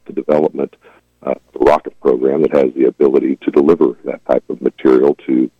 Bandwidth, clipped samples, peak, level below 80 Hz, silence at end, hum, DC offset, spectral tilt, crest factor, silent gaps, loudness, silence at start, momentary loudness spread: 7.2 kHz; under 0.1%; -2 dBFS; -48 dBFS; 0.1 s; none; under 0.1%; -8.5 dB/octave; 12 dB; none; -14 LUFS; 0.1 s; 12 LU